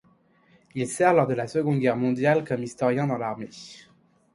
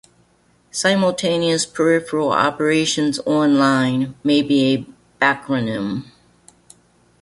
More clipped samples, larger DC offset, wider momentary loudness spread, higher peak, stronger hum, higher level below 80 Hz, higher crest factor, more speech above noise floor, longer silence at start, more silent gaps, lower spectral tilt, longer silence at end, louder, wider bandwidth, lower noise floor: neither; neither; first, 17 LU vs 7 LU; second, -6 dBFS vs -2 dBFS; neither; second, -66 dBFS vs -58 dBFS; about the same, 18 dB vs 18 dB; about the same, 37 dB vs 40 dB; about the same, 0.75 s vs 0.75 s; neither; first, -6.5 dB/octave vs -4.5 dB/octave; second, 0.6 s vs 1.2 s; second, -24 LUFS vs -18 LUFS; about the same, 11.5 kHz vs 11.5 kHz; about the same, -61 dBFS vs -58 dBFS